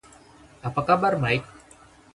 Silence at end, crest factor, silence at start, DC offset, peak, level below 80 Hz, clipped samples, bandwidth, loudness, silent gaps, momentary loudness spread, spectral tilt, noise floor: 0.7 s; 20 dB; 0.65 s; under 0.1%; -6 dBFS; -54 dBFS; under 0.1%; 11.5 kHz; -24 LUFS; none; 9 LU; -6.5 dB/octave; -52 dBFS